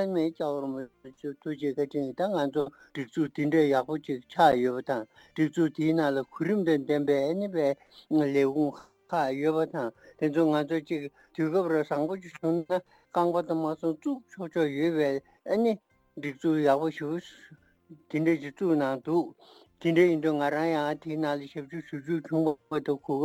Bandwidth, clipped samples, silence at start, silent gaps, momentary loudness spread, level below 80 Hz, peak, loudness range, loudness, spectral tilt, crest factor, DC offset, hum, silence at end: 16 kHz; under 0.1%; 0 s; none; 12 LU; -72 dBFS; -8 dBFS; 3 LU; -29 LUFS; -7.5 dB/octave; 20 dB; under 0.1%; none; 0 s